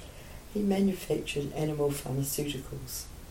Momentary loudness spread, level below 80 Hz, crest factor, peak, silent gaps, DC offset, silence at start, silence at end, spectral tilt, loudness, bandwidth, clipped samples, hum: 11 LU; -48 dBFS; 16 dB; -16 dBFS; none; under 0.1%; 0 s; 0 s; -5.5 dB/octave; -32 LUFS; 16.5 kHz; under 0.1%; none